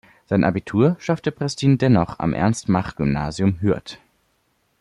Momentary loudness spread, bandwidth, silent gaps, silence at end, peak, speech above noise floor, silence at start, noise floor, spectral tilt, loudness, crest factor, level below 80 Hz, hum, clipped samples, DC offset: 6 LU; 11.5 kHz; none; 0.85 s; -4 dBFS; 47 dB; 0.3 s; -67 dBFS; -7 dB/octave; -21 LUFS; 16 dB; -46 dBFS; none; under 0.1%; under 0.1%